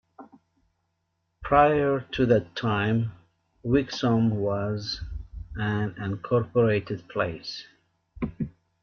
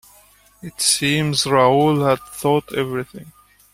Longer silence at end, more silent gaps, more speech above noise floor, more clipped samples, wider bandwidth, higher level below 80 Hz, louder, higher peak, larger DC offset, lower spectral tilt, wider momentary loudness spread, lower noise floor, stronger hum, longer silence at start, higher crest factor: about the same, 0.35 s vs 0.45 s; neither; first, 52 dB vs 33 dB; neither; second, 6.8 kHz vs 16 kHz; first, -48 dBFS vs -54 dBFS; second, -26 LUFS vs -18 LUFS; second, -8 dBFS vs -2 dBFS; neither; first, -7.5 dB/octave vs -4 dB/octave; about the same, 15 LU vs 15 LU; first, -76 dBFS vs -52 dBFS; neither; second, 0.2 s vs 0.65 s; about the same, 18 dB vs 18 dB